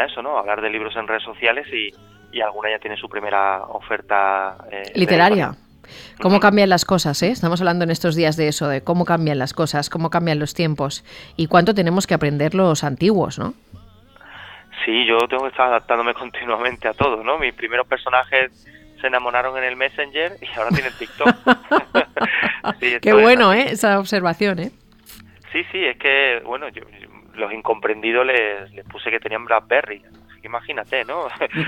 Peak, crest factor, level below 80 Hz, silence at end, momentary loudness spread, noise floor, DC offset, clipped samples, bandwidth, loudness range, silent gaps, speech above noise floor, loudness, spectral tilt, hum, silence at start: 0 dBFS; 18 dB; -52 dBFS; 0 s; 12 LU; -46 dBFS; under 0.1%; under 0.1%; 16.5 kHz; 6 LU; none; 27 dB; -19 LUFS; -5 dB/octave; none; 0 s